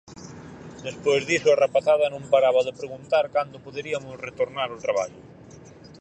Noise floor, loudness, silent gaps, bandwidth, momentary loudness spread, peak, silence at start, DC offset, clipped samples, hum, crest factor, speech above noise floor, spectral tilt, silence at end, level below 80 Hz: -46 dBFS; -23 LUFS; none; 9.2 kHz; 18 LU; -6 dBFS; 0.1 s; under 0.1%; under 0.1%; none; 18 dB; 23 dB; -4 dB/octave; 0.3 s; -62 dBFS